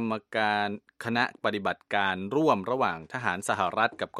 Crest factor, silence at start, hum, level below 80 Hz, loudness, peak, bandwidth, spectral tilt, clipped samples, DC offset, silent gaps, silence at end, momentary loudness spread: 20 dB; 0 s; none; -70 dBFS; -28 LUFS; -8 dBFS; 14 kHz; -4.5 dB/octave; under 0.1%; under 0.1%; none; 0 s; 6 LU